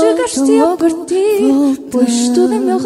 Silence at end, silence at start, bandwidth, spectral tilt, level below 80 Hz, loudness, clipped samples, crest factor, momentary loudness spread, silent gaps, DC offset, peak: 0 s; 0 s; 15.5 kHz; -4 dB/octave; -54 dBFS; -13 LUFS; under 0.1%; 12 dB; 4 LU; none; under 0.1%; 0 dBFS